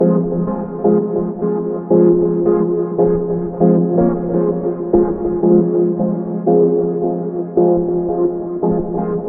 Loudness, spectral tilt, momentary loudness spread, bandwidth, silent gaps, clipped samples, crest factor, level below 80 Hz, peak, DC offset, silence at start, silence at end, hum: -16 LUFS; -14 dB/octave; 7 LU; 2.2 kHz; none; under 0.1%; 14 dB; -40 dBFS; 0 dBFS; under 0.1%; 0 s; 0 s; none